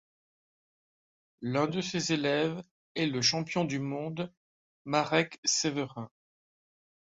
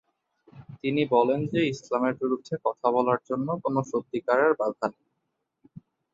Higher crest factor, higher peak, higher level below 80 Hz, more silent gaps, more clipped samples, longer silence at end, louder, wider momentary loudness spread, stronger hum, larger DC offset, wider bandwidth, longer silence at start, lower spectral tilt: about the same, 24 dB vs 20 dB; about the same, -10 dBFS vs -8 dBFS; about the same, -70 dBFS vs -68 dBFS; first, 2.71-2.95 s, 4.37-4.85 s, 5.38-5.43 s vs none; neither; first, 1.05 s vs 0.35 s; second, -30 LUFS vs -26 LUFS; first, 14 LU vs 8 LU; neither; neither; about the same, 8 kHz vs 7.8 kHz; first, 1.4 s vs 0.55 s; second, -3.5 dB/octave vs -7 dB/octave